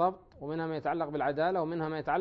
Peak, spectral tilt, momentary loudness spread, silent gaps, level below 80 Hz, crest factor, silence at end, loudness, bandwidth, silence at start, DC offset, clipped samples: -16 dBFS; -9 dB/octave; 7 LU; none; -62 dBFS; 16 dB; 0 s; -33 LUFS; 5.6 kHz; 0 s; under 0.1%; under 0.1%